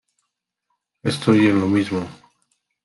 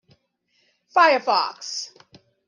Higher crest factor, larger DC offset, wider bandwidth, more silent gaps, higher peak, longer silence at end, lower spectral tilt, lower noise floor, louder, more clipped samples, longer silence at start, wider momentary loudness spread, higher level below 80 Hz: about the same, 20 dB vs 20 dB; neither; first, 12 kHz vs 10 kHz; neither; about the same, -2 dBFS vs -4 dBFS; about the same, 0.7 s vs 0.6 s; first, -6.5 dB/octave vs -1 dB/octave; first, -78 dBFS vs -68 dBFS; about the same, -19 LUFS vs -20 LUFS; neither; about the same, 1.05 s vs 0.95 s; about the same, 12 LU vs 14 LU; first, -62 dBFS vs -78 dBFS